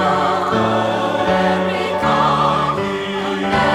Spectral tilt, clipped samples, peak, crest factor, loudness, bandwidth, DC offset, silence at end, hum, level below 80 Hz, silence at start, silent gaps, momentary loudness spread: -5.5 dB/octave; under 0.1%; -2 dBFS; 14 dB; -17 LUFS; 14 kHz; under 0.1%; 0 s; none; -44 dBFS; 0 s; none; 6 LU